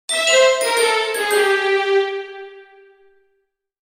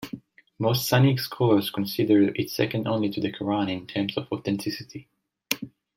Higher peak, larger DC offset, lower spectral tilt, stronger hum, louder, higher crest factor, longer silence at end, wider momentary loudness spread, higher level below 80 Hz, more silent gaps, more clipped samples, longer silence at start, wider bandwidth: about the same, -2 dBFS vs -4 dBFS; neither; second, 1.5 dB/octave vs -6 dB/octave; neither; first, -16 LUFS vs -25 LUFS; second, 16 dB vs 22 dB; first, 1.25 s vs 0.3 s; first, 15 LU vs 11 LU; second, -74 dBFS vs -62 dBFS; neither; neither; about the same, 0.1 s vs 0 s; about the same, 16 kHz vs 16.5 kHz